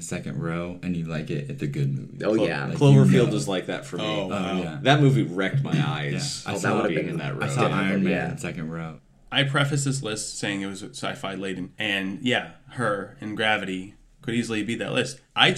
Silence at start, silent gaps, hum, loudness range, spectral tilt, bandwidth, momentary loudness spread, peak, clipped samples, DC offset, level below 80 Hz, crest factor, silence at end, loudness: 0 s; none; none; 6 LU; -5.5 dB/octave; 12.5 kHz; 12 LU; -2 dBFS; under 0.1%; under 0.1%; -56 dBFS; 22 dB; 0 s; -25 LUFS